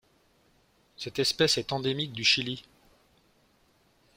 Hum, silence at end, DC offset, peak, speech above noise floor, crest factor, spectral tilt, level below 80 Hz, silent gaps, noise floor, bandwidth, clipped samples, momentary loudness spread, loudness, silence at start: none; 1.55 s; under 0.1%; -10 dBFS; 38 dB; 22 dB; -3 dB/octave; -64 dBFS; none; -66 dBFS; 16.5 kHz; under 0.1%; 13 LU; -26 LUFS; 1 s